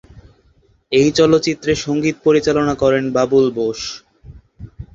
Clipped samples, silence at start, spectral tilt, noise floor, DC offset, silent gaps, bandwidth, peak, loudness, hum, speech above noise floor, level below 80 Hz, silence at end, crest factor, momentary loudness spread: under 0.1%; 0.15 s; -5 dB/octave; -55 dBFS; under 0.1%; none; 7.8 kHz; -2 dBFS; -16 LUFS; none; 40 dB; -44 dBFS; 0.1 s; 16 dB; 11 LU